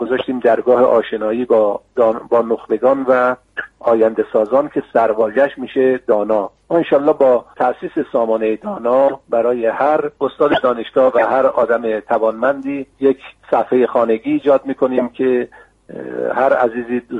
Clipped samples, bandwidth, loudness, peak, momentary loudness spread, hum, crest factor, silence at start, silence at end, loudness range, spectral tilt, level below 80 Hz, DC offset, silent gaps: under 0.1%; 4.6 kHz; -16 LUFS; -2 dBFS; 6 LU; none; 14 dB; 0 s; 0 s; 2 LU; -7.5 dB/octave; -56 dBFS; under 0.1%; none